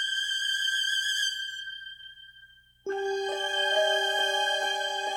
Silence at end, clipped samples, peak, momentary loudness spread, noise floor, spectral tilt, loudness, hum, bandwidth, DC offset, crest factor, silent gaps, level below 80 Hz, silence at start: 0 s; under 0.1%; -14 dBFS; 15 LU; -56 dBFS; 1.5 dB/octave; -27 LUFS; 60 Hz at -70 dBFS; 17 kHz; under 0.1%; 16 dB; none; -72 dBFS; 0 s